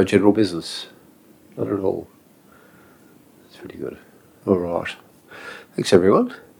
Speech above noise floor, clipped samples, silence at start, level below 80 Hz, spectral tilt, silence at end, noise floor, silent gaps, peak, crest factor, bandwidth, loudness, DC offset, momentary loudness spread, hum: 32 dB; under 0.1%; 0 s; -60 dBFS; -6 dB/octave; 0.2 s; -51 dBFS; none; 0 dBFS; 22 dB; 19 kHz; -21 LUFS; under 0.1%; 23 LU; none